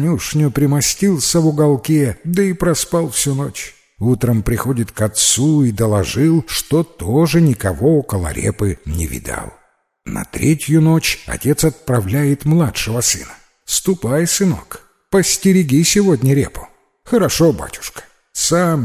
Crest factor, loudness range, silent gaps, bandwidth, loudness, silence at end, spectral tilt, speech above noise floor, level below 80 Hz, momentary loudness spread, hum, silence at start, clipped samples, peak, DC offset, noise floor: 14 dB; 3 LU; none; 16 kHz; -15 LUFS; 0 s; -5 dB/octave; 32 dB; -36 dBFS; 12 LU; none; 0 s; under 0.1%; 0 dBFS; under 0.1%; -47 dBFS